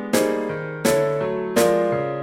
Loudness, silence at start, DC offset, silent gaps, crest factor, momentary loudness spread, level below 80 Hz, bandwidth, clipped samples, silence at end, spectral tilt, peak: -21 LUFS; 0 s; under 0.1%; none; 16 dB; 6 LU; -56 dBFS; 16.5 kHz; under 0.1%; 0 s; -4.5 dB/octave; -4 dBFS